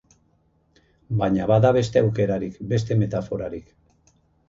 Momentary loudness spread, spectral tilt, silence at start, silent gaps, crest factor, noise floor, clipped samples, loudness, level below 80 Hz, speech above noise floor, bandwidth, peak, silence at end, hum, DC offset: 12 LU; -8 dB/octave; 1.1 s; none; 18 dB; -64 dBFS; under 0.1%; -22 LUFS; -48 dBFS; 42 dB; 7.6 kHz; -4 dBFS; 0.9 s; none; under 0.1%